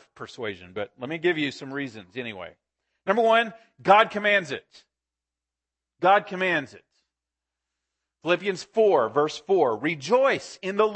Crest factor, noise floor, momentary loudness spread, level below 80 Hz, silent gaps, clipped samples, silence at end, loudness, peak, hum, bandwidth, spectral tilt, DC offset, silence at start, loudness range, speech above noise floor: 22 dB; -89 dBFS; 15 LU; -74 dBFS; none; under 0.1%; 0 s; -24 LUFS; -4 dBFS; none; 8.8 kHz; -4.5 dB/octave; under 0.1%; 0.2 s; 4 LU; 65 dB